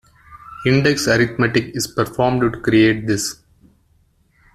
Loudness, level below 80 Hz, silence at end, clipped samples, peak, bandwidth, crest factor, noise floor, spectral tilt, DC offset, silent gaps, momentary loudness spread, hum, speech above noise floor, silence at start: -17 LUFS; -46 dBFS; 1.2 s; under 0.1%; -2 dBFS; 14 kHz; 16 dB; -58 dBFS; -5 dB/octave; under 0.1%; none; 8 LU; none; 42 dB; 0.3 s